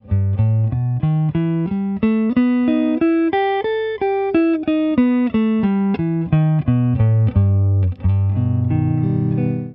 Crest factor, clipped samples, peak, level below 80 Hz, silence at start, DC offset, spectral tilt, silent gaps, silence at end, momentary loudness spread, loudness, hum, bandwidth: 12 dB; under 0.1%; -4 dBFS; -40 dBFS; 0.05 s; under 0.1%; -12.5 dB/octave; none; 0 s; 4 LU; -18 LUFS; none; 4.6 kHz